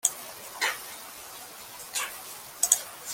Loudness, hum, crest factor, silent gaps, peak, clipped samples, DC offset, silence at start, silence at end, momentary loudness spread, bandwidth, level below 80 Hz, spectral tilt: -29 LUFS; none; 30 dB; none; -2 dBFS; under 0.1%; under 0.1%; 0.05 s; 0 s; 18 LU; 17 kHz; -72 dBFS; 2 dB/octave